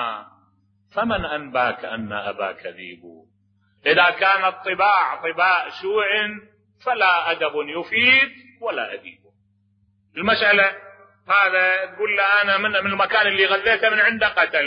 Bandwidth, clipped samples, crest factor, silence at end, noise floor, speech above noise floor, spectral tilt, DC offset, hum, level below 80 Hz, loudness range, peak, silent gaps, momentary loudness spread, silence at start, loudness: 5.4 kHz; under 0.1%; 16 dB; 0 s; -63 dBFS; 43 dB; -6 dB/octave; under 0.1%; none; -54 dBFS; 5 LU; -4 dBFS; none; 15 LU; 0 s; -19 LUFS